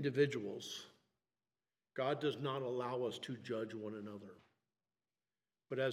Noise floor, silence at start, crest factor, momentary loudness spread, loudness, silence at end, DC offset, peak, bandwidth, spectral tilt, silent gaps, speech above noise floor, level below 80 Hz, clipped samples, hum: under -90 dBFS; 0 s; 20 dB; 15 LU; -41 LUFS; 0 s; under 0.1%; -22 dBFS; 14 kHz; -5.5 dB/octave; none; over 50 dB; -90 dBFS; under 0.1%; none